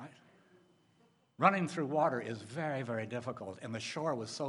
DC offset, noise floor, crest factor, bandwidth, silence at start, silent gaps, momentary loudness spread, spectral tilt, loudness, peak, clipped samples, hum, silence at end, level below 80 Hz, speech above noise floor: under 0.1%; -70 dBFS; 26 dB; 11.5 kHz; 0 s; none; 13 LU; -5.5 dB/octave; -35 LUFS; -12 dBFS; under 0.1%; none; 0 s; -82 dBFS; 35 dB